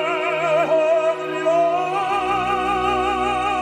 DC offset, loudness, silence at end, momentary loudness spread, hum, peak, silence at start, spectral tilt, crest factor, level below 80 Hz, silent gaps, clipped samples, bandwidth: under 0.1%; -20 LUFS; 0 s; 4 LU; none; -8 dBFS; 0 s; -4.5 dB/octave; 12 dB; -46 dBFS; none; under 0.1%; 12.5 kHz